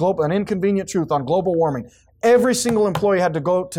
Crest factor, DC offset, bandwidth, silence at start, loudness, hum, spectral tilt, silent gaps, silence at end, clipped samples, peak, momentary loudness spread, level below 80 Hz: 12 dB; under 0.1%; 16.5 kHz; 0 s; -19 LUFS; none; -5.5 dB/octave; none; 0 s; under 0.1%; -6 dBFS; 6 LU; -52 dBFS